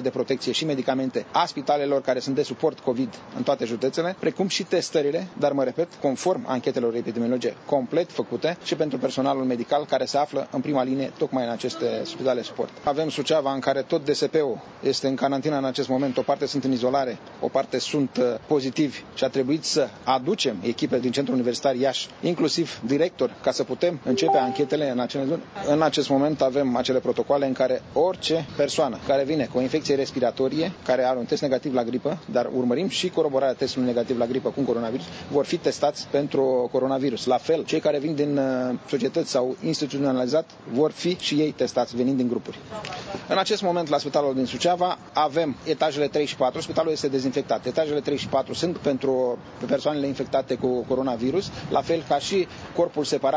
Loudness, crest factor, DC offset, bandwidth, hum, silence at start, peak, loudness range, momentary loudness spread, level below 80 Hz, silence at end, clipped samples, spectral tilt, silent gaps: -25 LUFS; 18 dB; under 0.1%; 8 kHz; none; 0 s; -6 dBFS; 2 LU; 4 LU; -60 dBFS; 0 s; under 0.1%; -5 dB/octave; none